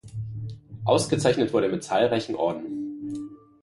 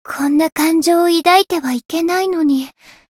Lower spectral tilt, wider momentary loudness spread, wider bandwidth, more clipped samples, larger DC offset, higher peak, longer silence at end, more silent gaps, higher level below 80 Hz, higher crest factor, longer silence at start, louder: first, -5.5 dB/octave vs -2.5 dB/octave; first, 14 LU vs 8 LU; second, 11.5 kHz vs 17 kHz; neither; neither; second, -6 dBFS vs 0 dBFS; second, 0.25 s vs 0.5 s; neither; about the same, -56 dBFS vs -58 dBFS; first, 20 dB vs 14 dB; about the same, 0.05 s vs 0.05 s; second, -25 LUFS vs -15 LUFS